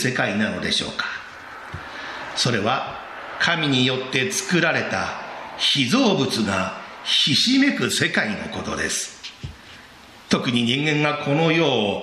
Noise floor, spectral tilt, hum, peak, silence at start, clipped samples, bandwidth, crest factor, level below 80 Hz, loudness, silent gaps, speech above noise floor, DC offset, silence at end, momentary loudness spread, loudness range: -45 dBFS; -3.5 dB/octave; none; -2 dBFS; 0 s; under 0.1%; 14.5 kHz; 20 dB; -52 dBFS; -20 LUFS; none; 24 dB; under 0.1%; 0 s; 16 LU; 5 LU